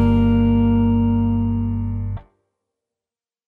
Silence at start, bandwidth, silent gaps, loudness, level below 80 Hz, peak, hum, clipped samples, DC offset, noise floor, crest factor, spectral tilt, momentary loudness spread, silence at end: 0 s; 3.5 kHz; none; -18 LUFS; -30 dBFS; -6 dBFS; none; under 0.1%; under 0.1%; under -90 dBFS; 14 dB; -11 dB/octave; 11 LU; 1.25 s